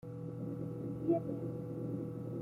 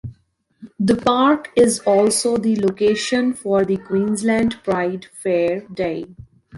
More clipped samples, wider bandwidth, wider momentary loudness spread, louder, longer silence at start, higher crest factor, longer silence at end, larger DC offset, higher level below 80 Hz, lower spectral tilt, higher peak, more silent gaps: neither; about the same, 12 kHz vs 12 kHz; about the same, 7 LU vs 9 LU; second, -40 LUFS vs -18 LUFS; about the same, 0.05 s vs 0.05 s; about the same, 18 dB vs 16 dB; about the same, 0 s vs 0 s; neither; second, -68 dBFS vs -52 dBFS; first, -11 dB/octave vs -4.5 dB/octave; second, -20 dBFS vs -4 dBFS; neither